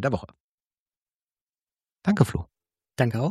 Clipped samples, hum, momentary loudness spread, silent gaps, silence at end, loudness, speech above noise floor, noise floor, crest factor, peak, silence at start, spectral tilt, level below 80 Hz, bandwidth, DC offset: under 0.1%; none; 18 LU; 0.40-0.58 s, 0.65-0.71 s, 0.78-0.86 s, 0.97-1.06 s, 1.14-1.29 s, 1.41-1.53 s; 0 s; -26 LUFS; over 66 dB; under -90 dBFS; 24 dB; -4 dBFS; 0 s; -7.5 dB/octave; -50 dBFS; 14 kHz; under 0.1%